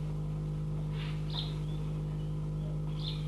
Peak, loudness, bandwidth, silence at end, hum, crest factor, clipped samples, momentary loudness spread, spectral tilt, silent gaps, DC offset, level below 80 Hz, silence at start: -24 dBFS; -36 LUFS; 8.4 kHz; 0 s; 50 Hz at -45 dBFS; 12 dB; under 0.1%; 1 LU; -7.5 dB/octave; none; under 0.1%; -44 dBFS; 0 s